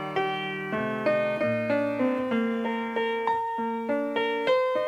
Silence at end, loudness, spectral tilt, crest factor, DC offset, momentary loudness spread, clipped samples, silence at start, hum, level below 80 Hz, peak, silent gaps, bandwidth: 0 s; -27 LUFS; -6.5 dB/octave; 14 dB; under 0.1%; 5 LU; under 0.1%; 0 s; none; -66 dBFS; -12 dBFS; none; 13 kHz